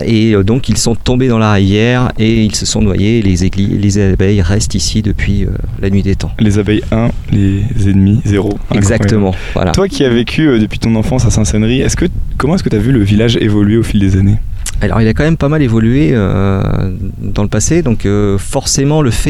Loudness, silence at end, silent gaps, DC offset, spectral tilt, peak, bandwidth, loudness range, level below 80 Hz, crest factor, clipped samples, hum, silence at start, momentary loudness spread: -12 LUFS; 0 s; none; under 0.1%; -6 dB/octave; 0 dBFS; 13 kHz; 2 LU; -20 dBFS; 10 dB; under 0.1%; none; 0 s; 5 LU